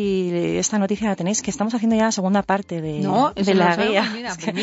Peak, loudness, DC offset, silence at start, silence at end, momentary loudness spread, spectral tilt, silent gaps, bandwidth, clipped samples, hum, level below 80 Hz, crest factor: -2 dBFS; -20 LUFS; under 0.1%; 0 s; 0 s; 7 LU; -4.5 dB/octave; none; 8 kHz; under 0.1%; none; -52 dBFS; 20 dB